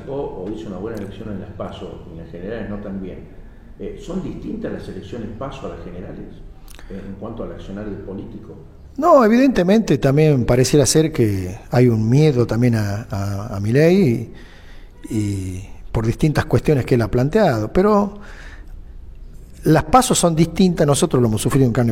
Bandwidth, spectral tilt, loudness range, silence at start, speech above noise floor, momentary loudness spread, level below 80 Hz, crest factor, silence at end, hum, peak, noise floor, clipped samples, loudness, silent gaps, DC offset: 16.5 kHz; -6 dB/octave; 16 LU; 0 s; 20 dB; 20 LU; -36 dBFS; 16 dB; 0 s; none; -2 dBFS; -38 dBFS; under 0.1%; -17 LUFS; none; under 0.1%